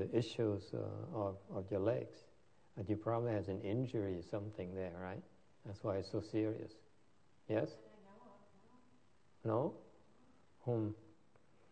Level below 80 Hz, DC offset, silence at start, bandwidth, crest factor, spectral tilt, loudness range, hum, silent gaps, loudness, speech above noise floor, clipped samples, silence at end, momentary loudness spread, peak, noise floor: -76 dBFS; under 0.1%; 0 s; 9 kHz; 20 dB; -8 dB/octave; 4 LU; none; none; -42 LUFS; 33 dB; under 0.1%; 0.6 s; 18 LU; -22 dBFS; -73 dBFS